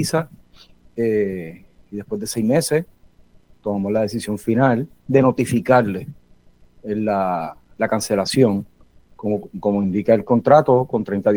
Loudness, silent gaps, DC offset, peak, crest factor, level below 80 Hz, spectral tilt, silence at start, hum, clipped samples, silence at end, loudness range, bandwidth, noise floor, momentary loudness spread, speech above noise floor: -19 LUFS; none; under 0.1%; 0 dBFS; 20 dB; -54 dBFS; -6 dB/octave; 0 s; none; under 0.1%; 0 s; 5 LU; over 20 kHz; -50 dBFS; 16 LU; 32 dB